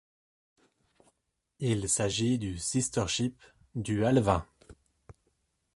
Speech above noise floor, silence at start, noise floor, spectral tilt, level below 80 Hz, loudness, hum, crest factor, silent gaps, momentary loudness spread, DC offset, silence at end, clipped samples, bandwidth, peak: 50 dB; 1.6 s; -79 dBFS; -4.5 dB/octave; -52 dBFS; -29 LUFS; none; 22 dB; none; 9 LU; under 0.1%; 1.05 s; under 0.1%; 11.5 kHz; -10 dBFS